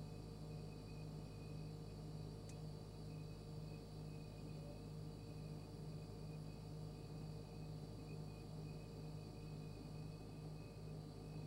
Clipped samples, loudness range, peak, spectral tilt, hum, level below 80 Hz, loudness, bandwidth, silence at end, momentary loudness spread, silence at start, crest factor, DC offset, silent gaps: under 0.1%; 0 LU; -40 dBFS; -7 dB/octave; none; -62 dBFS; -53 LUFS; 16 kHz; 0 s; 1 LU; 0 s; 12 dB; under 0.1%; none